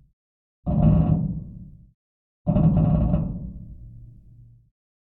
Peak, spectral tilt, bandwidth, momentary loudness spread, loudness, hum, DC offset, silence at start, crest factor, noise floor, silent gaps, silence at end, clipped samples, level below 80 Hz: -6 dBFS; -14 dB/octave; 3 kHz; 23 LU; -22 LUFS; none; under 0.1%; 0.65 s; 18 dB; -50 dBFS; 1.94-2.45 s; 1.1 s; under 0.1%; -32 dBFS